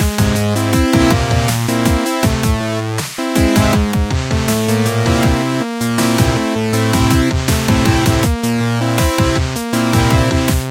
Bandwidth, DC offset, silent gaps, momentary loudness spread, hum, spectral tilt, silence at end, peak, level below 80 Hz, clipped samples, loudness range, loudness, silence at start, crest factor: 17 kHz; under 0.1%; none; 5 LU; none; -5 dB/octave; 0 s; 0 dBFS; -24 dBFS; under 0.1%; 1 LU; -14 LUFS; 0 s; 14 dB